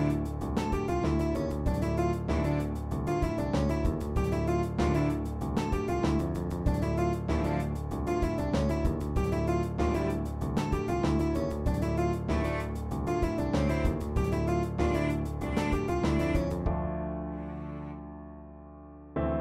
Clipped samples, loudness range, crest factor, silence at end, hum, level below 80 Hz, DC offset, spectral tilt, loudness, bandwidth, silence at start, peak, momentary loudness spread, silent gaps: under 0.1%; 1 LU; 16 dB; 0 s; none; -36 dBFS; under 0.1%; -7.5 dB/octave; -30 LUFS; 15 kHz; 0 s; -14 dBFS; 7 LU; none